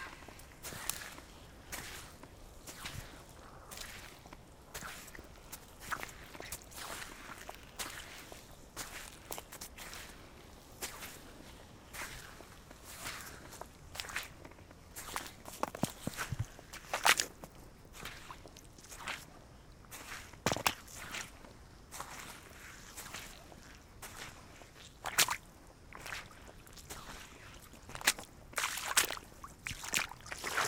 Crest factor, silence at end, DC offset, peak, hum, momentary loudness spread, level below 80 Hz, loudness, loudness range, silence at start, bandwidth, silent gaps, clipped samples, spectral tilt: 36 dB; 0 s; under 0.1%; -8 dBFS; none; 21 LU; -60 dBFS; -40 LUFS; 12 LU; 0 s; 18 kHz; none; under 0.1%; -1.5 dB/octave